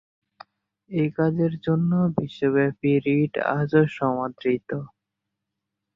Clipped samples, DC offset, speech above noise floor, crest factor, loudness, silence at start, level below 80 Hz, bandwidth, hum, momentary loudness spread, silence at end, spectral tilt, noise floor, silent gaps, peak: under 0.1%; under 0.1%; 60 dB; 18 dB; -23 LUFS; 0.9 s; -60 dBFS; 5.6 kHz; none; 6 LU; 1.1 s; -10 dB/octave; -83 dBFS; none; -6 dBFS